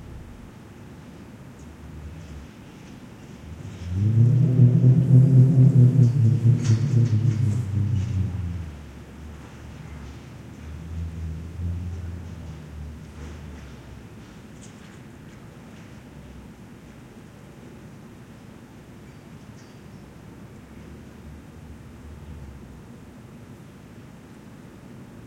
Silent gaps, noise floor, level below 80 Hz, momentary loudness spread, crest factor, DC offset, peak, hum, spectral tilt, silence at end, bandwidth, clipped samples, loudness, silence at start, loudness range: none; -44 dBFS; -48 dBFS; 28 LU; 20 dB; under 0.1%; -6 dBFS; none; -9 dB/octave; 0 s; 8.2 kHz; under 0.1%; -20 LUFS; 0 s; 27 LU